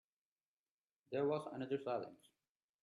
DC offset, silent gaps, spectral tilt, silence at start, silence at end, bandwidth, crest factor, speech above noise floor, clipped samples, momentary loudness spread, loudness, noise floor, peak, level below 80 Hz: under 0.1%; none; -7.5 dB/octave; 1.1 s; 0.65 s; 11.5 kHz; 18 dB; over 48 dB; under 0.1%; 7 LU; -42 LUFS; under -90 dBFS; -28 dBFS; -88 dBFS